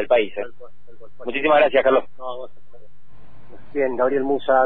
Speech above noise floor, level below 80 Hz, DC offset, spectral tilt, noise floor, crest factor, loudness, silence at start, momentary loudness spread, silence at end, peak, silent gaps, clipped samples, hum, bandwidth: 33 dB; -54 dBFS; 4%; -8.5 dB/octave; -53 dBFS; 18 dB; -20 LUFS; 0 s; 19 LU; 0 s; -4 dBFS; none; under 0.1%; none; 4.1 kHz